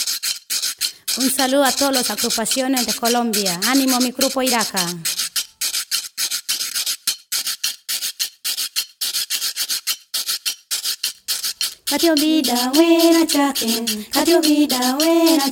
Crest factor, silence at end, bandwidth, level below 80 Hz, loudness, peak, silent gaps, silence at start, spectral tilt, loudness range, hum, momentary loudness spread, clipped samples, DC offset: 18 dB; 0 s; 18.5 kHz; -62 dBFS; -18 LUFS; -2 dBFS; none; 0 s; -1.5 dB/octave; 5 LU; none; 7 LU; under 0.1%; under 0.1%